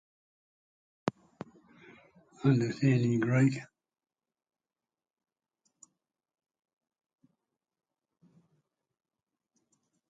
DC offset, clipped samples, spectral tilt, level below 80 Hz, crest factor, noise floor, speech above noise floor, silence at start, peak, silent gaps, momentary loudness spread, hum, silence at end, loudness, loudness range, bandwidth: under 0.1%; under 0.1%; -7.5 dB/octave; -74 dBFS; 24 dB; under -90 dBFS; over 63 dB; 1.05 s; -12 dBFS; none; 23 LU; none; 6.45 s; -29 LUFS; 4 LU; 7.8 kHz